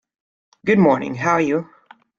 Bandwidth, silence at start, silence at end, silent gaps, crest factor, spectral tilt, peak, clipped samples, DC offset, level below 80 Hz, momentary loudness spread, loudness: 7.4 kHz; 0.65 s; 0.55 s; none; 18 dB; -7 dB/octave; -2 dBFS; under 0.1%; under 0.1%; -60 dBFS; 9 LU; -18 LUFS